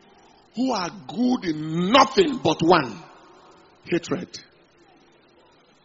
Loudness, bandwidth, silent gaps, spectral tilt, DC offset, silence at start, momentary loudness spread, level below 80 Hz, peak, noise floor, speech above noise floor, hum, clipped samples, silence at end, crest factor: -22 LUFS; 7.6 kHz; none; -3.5 dB/octave; under 0.1%; 0.55 s; 19 LU; -60 dBFS; -2 dBFS; -56 dBFS; 35 dB; none; under 0.1%; 1.45 s; 22 dB